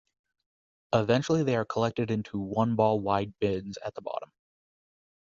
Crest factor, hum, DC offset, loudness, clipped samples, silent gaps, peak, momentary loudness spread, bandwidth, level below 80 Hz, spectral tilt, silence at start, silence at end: 20 dB; none; under 0.1%; -29 LUFS; under 0.1%; none; -8 dBFS; 12 LU; 7.6 kHz; -60 dBFS; -7 dB/octave; 0.9 s; 1 s